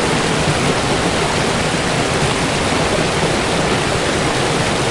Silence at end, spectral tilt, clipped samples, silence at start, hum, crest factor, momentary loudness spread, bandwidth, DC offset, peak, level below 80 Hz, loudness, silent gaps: 0 s; -4 dB/octave; under 0.1%; 0 s; none; 14 dB; 1 LU; 11.5 kHz; under 0.1%; -4 dBFS; -34 dBFS; -16 LUFS; none